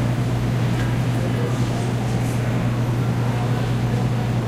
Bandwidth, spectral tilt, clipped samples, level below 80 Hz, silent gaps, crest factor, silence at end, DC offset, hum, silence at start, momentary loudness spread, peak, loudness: 15.5 kHz; -7 dB/octave; under 0.1%; -36 dBFS; none; 12 dB; 0 s; under 0.1%; none; 0 s; 1 LU; -10 dBFS; -22 LUFS